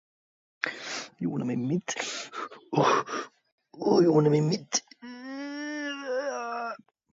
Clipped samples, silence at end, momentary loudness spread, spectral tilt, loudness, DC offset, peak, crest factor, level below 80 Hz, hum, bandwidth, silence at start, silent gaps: under 0.1%; 0.35 s; 16 LU; -5 dB/octave; -28 LUFS; under 0.1%; -8 dBFS; 20 dB; -74 dBFS; none; 7.8 kHz; 0.65 s; 3.52-3.58 s